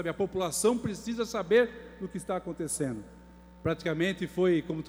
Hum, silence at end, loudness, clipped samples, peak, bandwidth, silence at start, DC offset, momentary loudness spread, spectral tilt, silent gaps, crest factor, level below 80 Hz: none; 0 s; -30 LUFS; under 0.1%; -12 dBFS; over 20 kHz; 0 s; under 0.1%; 10 LU; -5 dB/octave; none; 18 dB; -56 dBFS